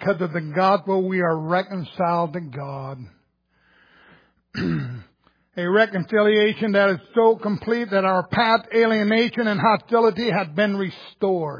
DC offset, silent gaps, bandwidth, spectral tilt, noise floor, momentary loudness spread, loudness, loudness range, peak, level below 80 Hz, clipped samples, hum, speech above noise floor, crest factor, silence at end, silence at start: under 0.1%; none; 5.2 kHz; -7.5 dB/octave; -65 dBFS; 13 LU; -21 LUFS; 10 LU; -4 dBFS; -62 dBFS; under 0.1%; none; 44 dB; 18 dB; 0 s; 0 s